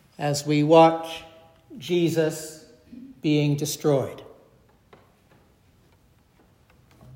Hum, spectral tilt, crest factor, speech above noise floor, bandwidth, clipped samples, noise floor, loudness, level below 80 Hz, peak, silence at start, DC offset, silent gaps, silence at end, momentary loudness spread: none; -5.5 dB/octave; 22 dB; 38 dB; 16 kHz; under 0.1%; -59 dBFS; -22 LUFS; -66 dBFS; -2 dBFS; 0.2 s; under 0.1%; none; 2.9 s; 23 LU